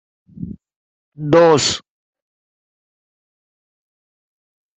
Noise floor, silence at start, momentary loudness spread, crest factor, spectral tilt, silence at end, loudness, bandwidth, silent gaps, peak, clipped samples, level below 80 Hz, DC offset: -33 dBFS; 0.4 s; 22 LU; 20 dB; -4 dB/octave; 3 s; -14 LUFS; 8.2 kHz; 0.76-1.12 s; -2 dBFS; under 0.1%; -56 dBFS; under 0.1%